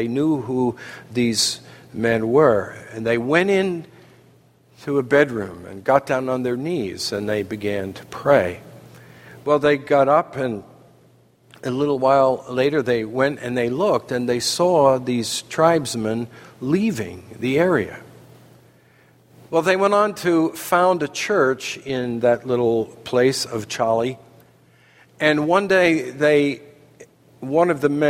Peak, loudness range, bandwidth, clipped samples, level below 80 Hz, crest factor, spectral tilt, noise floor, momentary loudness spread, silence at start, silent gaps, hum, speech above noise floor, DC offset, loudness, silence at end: 0 dBFS; 3 LU; 16 kHz; under 0.1%; -60 dBFS; 20 dB; -5 dB/octave; -54 dBFS; 12 LU; 0 s; none; none; 35 dB; under 0.1%; -20 LUFS; 0 s